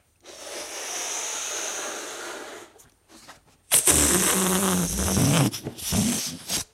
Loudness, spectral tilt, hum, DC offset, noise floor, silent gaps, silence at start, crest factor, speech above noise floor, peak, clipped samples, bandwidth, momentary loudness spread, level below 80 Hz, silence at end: -23 LUFS; -3 dB/octave; none; under 0.1%; -54 dBFS; none; 0.25 s; 24 dB; 30 dB; -2 dBFS; under 0.1%; 16 kHz; 18 LU; -44 dBFS; 0.1 s